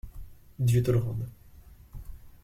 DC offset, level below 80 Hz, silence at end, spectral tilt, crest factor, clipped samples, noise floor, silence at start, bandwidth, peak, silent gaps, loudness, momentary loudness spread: under 0.1%; -46 dBFS; 0.15 s; -7.5 dB/octave; 16 dB; under 0.1%; -51 dBFS; 0.05 s; 15.5 kHz; -14 dBFS; none; -28 LUFS; 25 LU